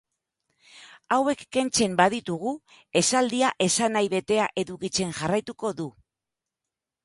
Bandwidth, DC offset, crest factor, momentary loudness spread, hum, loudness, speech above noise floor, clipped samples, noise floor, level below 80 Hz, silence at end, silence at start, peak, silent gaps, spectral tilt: 11.5 kHz; under 0.1%; 22 dB; 9 LU; none; -25 LUFS; 63 dB; under 0.1%; -87 dBFS; -62 dBFS; 1.15 s; 0.75 s; -6 dBFS; none; -3.5 dB/octave